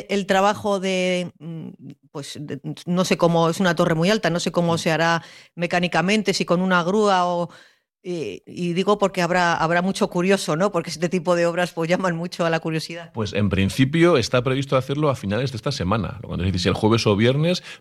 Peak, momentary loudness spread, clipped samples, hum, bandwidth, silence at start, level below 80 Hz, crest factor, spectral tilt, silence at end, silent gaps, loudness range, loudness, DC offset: -4 dBFS; 13 LU; under 0.1%; none; 13 kHz; 0 s; -52 dBFS; 16 dB; -5.5 dB/octave; 0.05 s; none; 2 LU; -21 LUFS; under 0.1%